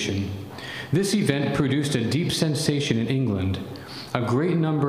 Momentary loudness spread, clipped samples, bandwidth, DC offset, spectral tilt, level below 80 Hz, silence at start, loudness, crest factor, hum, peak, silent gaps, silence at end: 11 LU; under 0.1%; 15.5 kHz; under 0.1%; -5.5 dB/octave; -56 dBFS; 0 s; -24 LUFS; 20 dB; none; -4 dBFS; none; 0 s